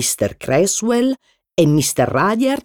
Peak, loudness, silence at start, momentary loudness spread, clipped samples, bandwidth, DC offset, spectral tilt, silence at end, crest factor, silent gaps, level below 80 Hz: -2 dBFS; -17 LUFS; 0 s; 6 LU; under 0.1%; over 20 kHz; under 0.1%; -4.5 dB/octave; 0.05 s; 14 dB; none; -50 dBFS